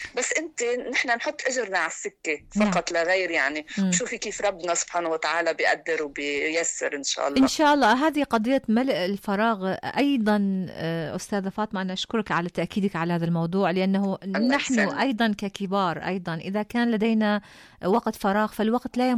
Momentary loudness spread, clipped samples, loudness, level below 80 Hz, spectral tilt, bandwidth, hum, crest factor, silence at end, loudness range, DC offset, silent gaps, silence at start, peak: 7 LU; under 0.1%; -25 LUFS; -58 dBFS; -4.5 dB/octave; 14.5 kHz; none; 12 dB; 0 s; 3 LU; under 0.1%; none; 0 s; -12 dBFS